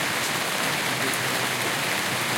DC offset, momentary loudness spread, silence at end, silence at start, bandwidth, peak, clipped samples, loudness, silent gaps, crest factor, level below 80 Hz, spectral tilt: under 0.1%; 0 LU; 0 s; 0 s; 17 kHz; -10 dBFS; under 0.1%; -24 LUFS; none; 14 dB; -66 dBFS; -2 dB/octave